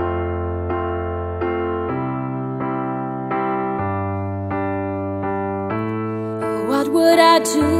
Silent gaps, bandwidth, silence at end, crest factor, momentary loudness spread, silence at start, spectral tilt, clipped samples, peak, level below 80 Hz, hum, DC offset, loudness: none; 15.5 kHz; 0 s; 20 dB; 10 LU; 0 s; -5.5 dB/octave; under 0.1%; 0 dBFS; -42 dBFS; none; under 0.1%; -21 LUFS